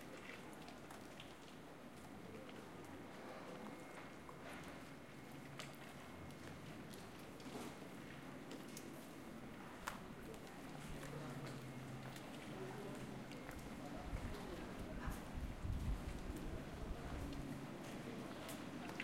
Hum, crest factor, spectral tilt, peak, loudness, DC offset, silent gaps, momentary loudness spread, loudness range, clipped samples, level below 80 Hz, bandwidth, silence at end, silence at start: none; 24 dB; -5.5 dB/octave; -26 dBFS; -52 LUFS; under 0.1%; none; 6 LU; 5 LU; under 0.1%; -56 dBFS; 16 kHz; 0 s; 0 s